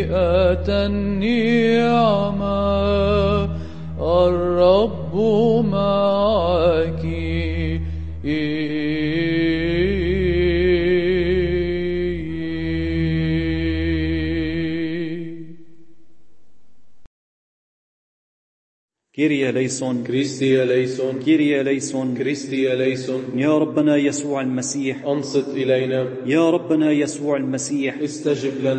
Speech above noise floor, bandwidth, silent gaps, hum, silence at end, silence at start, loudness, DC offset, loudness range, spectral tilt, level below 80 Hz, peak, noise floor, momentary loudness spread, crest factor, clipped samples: 45 dB; 8.8 kHz; 17.07-18.88 s; none; 0 s; 0 s; -20 LUFS; under 0.1%; 7 LU; -6 dB/octave; -34 dBFS; -4 dBFS; -63 dBFS; 7 LU; 16 dB; under 0.1%